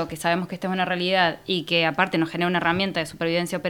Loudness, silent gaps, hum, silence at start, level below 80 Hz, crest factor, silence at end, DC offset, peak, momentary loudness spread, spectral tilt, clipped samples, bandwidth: -23 LUFS; none; none; 0 s; -58 dBFS; 20 dB; 0 s; under 0.1%; -4 dBFS; 5 LU; -5 dB/octave; under 0.1%; 19 kHz